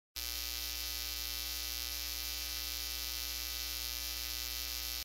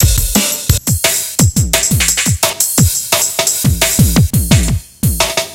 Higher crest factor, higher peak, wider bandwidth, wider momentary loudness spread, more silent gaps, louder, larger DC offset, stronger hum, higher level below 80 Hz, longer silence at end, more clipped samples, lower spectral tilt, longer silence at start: first, 22 dB vs 12 dB; second, -18 dBFS vs 0 dBFS; about the same, 16 kHz vs 17.5 kHz; second, 0 LU vs 3 LU; neither; second, -37 LUFS vs -12 LUFS; neither; first, 60 Hz at -50 dBFS vs none; second, -50 dBFS vs -22 dBFS; about the same, 0 s vs 0 s; neither; second, 0 dB/octave vs -3.5 dB/octave; first, 0.15 s vs 0 s